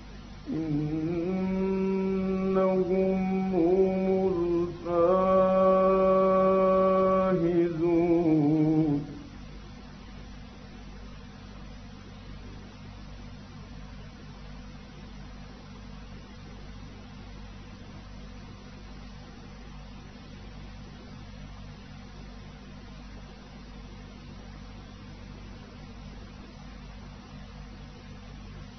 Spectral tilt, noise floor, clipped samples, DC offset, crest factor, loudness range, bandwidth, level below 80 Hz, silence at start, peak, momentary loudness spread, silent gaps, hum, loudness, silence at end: -8.5 dB/octave; -45 dBFS; under 0.1%; under 0.1%; 16 dB; 22 LU; 6.4 kHz; -48 dBFS; 0 s; -14 dBFS; 23 LU; none; 50 Hz at -50 dBFS; -25 LUFS; 0 s